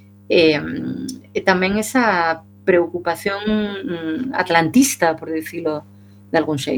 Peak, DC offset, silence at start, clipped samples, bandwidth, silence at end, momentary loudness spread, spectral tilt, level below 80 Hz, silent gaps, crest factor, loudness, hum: 0 dBFS; under 0.1%; 0.3 s; under 0.1%; 19 kHz; 0 s; 11 LU; -4 dB/octave; -52 dBFS; none; 18 dB; -19 LUFS; none